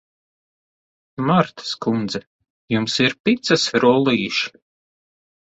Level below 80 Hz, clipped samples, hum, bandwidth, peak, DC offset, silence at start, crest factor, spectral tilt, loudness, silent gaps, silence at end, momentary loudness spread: -60 dBFS; under 0.1%; none; 8.2 kHz; -2 dBFS; under 0.1%; 1.2 s; 20 dB; -5 dB/octave; -19 LUFS; 2.27-2.39 s, 2.50-2.68 s, 3.20-3.24 s; 1.05 s; 11 LU